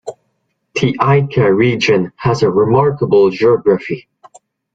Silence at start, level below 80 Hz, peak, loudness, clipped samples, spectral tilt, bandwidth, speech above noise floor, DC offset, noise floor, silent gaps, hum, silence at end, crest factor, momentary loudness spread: 0.05 s; -48 dBFS; 0 dBFS; -13 LUFS; under 0.1%; -7 dB/octave; 7.8 kHz; 55 dB; under 0.1%; -67 dBFS; none; none; 0.75 s; 14 dB; 9 LU